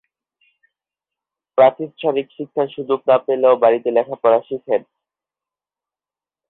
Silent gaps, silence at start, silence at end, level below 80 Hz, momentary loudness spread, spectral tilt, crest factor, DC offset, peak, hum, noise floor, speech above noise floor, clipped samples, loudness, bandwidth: none; 1.55 s; 1.7 s; -70 dBFS; 9 LU; -10 dB/octave; 18 dB; under 0.1%; -2 dBFS; none; under -90 dBFS; over 73 dB; under 0.1%; -18 LUFS; 4.1 kHz